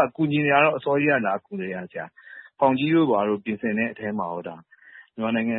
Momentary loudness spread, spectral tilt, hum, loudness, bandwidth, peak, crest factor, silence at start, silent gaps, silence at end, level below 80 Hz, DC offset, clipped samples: 18 LU; -11 dB/octave; none; -23 LUFS; 4.1 kHz; -4 dBFS; 20 dB; 0 s; none; 0 s; -68 dBFS; under 0.1%; under 0.1%